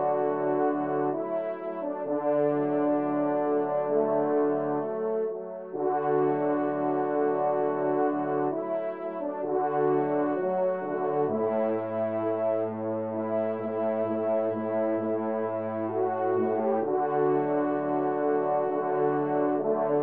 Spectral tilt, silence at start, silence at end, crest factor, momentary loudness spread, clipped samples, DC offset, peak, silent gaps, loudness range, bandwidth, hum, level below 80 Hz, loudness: -8 dB/octave; 0 s; 0 s; 14 dB; 5 LU; under 0.1%; 0.1%; -12 dBFS; none; 2 LU; 3.6 kHz; none; -80 dBFS; -28 LUFS